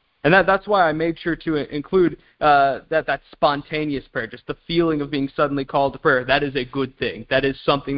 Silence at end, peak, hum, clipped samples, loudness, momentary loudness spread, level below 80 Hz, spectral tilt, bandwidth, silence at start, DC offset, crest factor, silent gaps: 0 s; 0 dBFS; none; under 0.1%; -20 LUFS; 10 LU; -48 dBFS; -10.5 dB/octave; 5.6 kHz; 0.25 s; under 0.1%; 20 dB; none